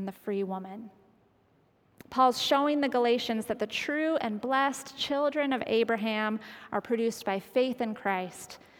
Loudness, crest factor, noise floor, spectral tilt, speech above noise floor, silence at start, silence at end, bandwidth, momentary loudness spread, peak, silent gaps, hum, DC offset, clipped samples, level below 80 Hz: -29 LUFS; 20 dB; -66 dBFS; -4 dB/octave; 37 dB; 0 s; 0.2 s; 19 kHz; 10 LU; -10 dBFS; none; none; under 0.1%; under 0.1%; -72 dBFS